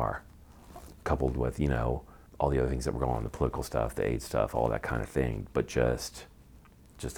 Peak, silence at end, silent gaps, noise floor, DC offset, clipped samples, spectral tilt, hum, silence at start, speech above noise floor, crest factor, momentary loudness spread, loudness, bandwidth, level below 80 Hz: -12 dBFS; 0 s; none; -55 dBFS; under 0.1%; under 0.1%; -6.5 dB/octave; none; 0 s; 25 dB; 20 dB; 12 LU; -31 LUFS; over 20 kHz; -40 dBFS